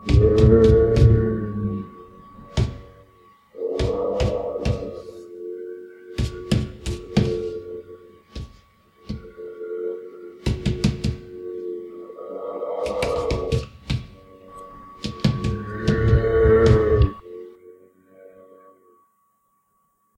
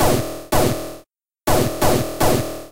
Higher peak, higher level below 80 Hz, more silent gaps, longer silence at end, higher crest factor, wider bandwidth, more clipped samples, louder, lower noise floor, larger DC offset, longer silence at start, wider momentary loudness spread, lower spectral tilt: about the same, -4 dBFS vs -4 dBFS; about the same, -30 dBFS vs -32 dBFS; neither; first, 2.45 s vs 0 s; about the same, 18 dB vs 16 dB; second, 11.5 kHz vs 16.5 kHz; neither; about the same, -22 LUFS vs -20 LUFS; first, -67 dBFS vs -50 dBFS; neither; about the same, 0 s vs 0 s; first, 23 LU vs 8 LU; first, -7.5 dB/octave vs -4.5 dB/octave